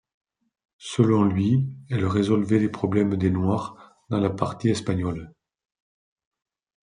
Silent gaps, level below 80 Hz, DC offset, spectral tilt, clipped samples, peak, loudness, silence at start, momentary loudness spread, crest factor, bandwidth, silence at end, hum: none; -58 dBFS; under 0.1%; -7.5 dB/octave; under 0.1%; -4 dBFS; -24 LUFS; 0.8 s; 9 LU; 20 dB; 10.5 kHz; 1.55 s; none